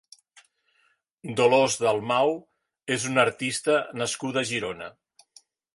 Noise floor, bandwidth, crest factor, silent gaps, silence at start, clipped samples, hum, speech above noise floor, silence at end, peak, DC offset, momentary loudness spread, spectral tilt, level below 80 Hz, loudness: -69 dBFS; 11.5 kHz; 22 dB; none; 1.25 s; under 0.1%; none; 44 dB; 0.85 s; -4 dBFS; under 0.1%; 16 LU; -3.5 dB/octave; -68 dBFS; -25 LUFS